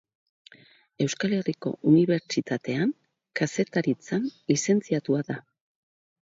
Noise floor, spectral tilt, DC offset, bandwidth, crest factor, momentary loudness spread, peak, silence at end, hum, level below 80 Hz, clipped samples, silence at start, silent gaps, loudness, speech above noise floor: -57 dBFS; -5.5 dB/octave; under 0.1%; 7.8 kHz; 18 dB; 9 LU; -8 dBFS; 0.8 s; none; -70 dBFS; under 0.1%; 1 s; none; -26 LUFS; 31 dB